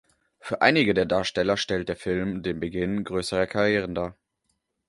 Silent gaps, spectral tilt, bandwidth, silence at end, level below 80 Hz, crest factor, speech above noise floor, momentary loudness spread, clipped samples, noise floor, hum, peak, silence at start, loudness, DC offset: none; -5 dB/octave; 11.5 kHz; 0.75 s; -50 dBFS; 22 dB; 51 dB; 10 LU; under 0.1%; -76 dBFS; none; -4 dBFS; 0.45 s; -25 LUFS; under 0.1%